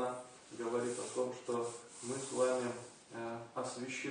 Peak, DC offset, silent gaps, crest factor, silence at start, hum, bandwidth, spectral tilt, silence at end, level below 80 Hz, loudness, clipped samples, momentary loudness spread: -20 dBFS; under 0.1%; none; 18 dB; 0 s; none; 10 kHz; -4 dB/octave; 0 s; -82 dBFS; -40 LUFS; under 0.1%; 13 LU